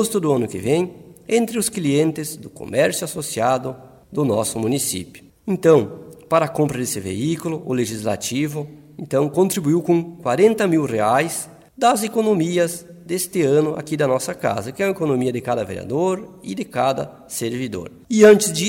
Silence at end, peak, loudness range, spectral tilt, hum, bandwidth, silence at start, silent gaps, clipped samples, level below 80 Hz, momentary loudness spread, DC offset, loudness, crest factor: 0 s; -2 dBFS; 4 LU; -5 dB/octave; none; 16.5 kHz; 0 s; none; under 0.1%; -56 dBFS; 12 LU; under 0.1%; -20 LUFS; 18 dB